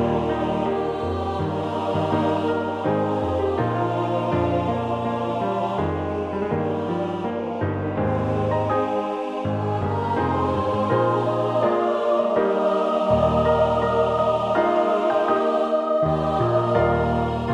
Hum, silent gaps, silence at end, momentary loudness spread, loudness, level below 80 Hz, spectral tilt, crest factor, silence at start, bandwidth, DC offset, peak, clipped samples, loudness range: none; none; 0 s; 6 LU; -22 LUFS; -42 dBFS; -8 dB/octave; 16 dB; 0 s; 10 kHz; under 0.1%; -6 dBFS; under 0.1%; 4 LU